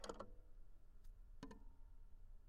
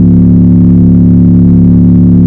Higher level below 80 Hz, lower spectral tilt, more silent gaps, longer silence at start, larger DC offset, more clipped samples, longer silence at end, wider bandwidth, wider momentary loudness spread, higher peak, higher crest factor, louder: second, -60 dBFS vs -18 dBFS; second, -4.5 dB/octave vs -14 dB/octave; neither; about the same, 0 s vs 0 s; second, under 0.1% vs 2%; second, under 0.1% vs 4%; about the same, 0 s vs 0 s; first, 12 kHz vs 1.6 kHz; first, 11 LU vs 0 LU; second, -36 dBFS vs 0 dBFS; first, 20 dB vs 4 dB; second, -63 LUFS vs -5 LUFS